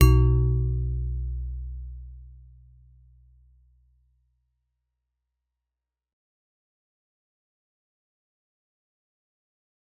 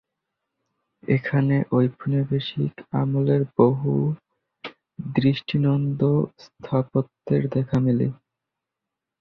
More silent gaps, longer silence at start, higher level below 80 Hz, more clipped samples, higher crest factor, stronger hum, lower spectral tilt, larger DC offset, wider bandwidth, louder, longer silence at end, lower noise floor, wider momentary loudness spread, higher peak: neither; second, 0 s vs 1.1 s; first, -32 dBFS vs -56 dBFS; neither; first, 26 dB vs 20 dB; neither; second, -8 dB/octave vs -10 dB/octave; neither; second, 4 kHz vs 5.8 kHz; second, -26 LUFS vs -23 LUFS; first, 7.65 s vs 1.05 s; about the same, -88 dBFS vs -85 dBFS; first, 23 LU vs 14 LU; about the same, -4 dBFS vs -4 dBFS